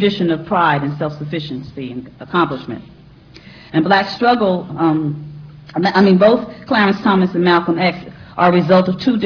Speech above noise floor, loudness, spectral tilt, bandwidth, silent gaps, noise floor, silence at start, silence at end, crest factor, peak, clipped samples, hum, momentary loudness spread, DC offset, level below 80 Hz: 26 dB; -15 LUFS; -8 dB/octave; 5.4 kHz; none; -41 dBFS; 0 s; 0 s; 16 dB; 0 dBFS; under 0.1%; none; 17 LU; under 0.1%; -50 dBFS